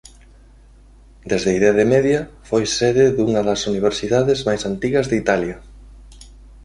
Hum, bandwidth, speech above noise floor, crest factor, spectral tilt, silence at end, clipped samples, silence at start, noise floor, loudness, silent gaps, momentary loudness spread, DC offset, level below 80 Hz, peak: none; 11.5 kHz; 29 dB; 18 dB; -5 dB/octave; 0.2 s; under 0.1%; 1.25 s; -46 dBFS; -18 LUFS; none; 7 LU; under 0.1%; -42 dBFS; -2 dBFS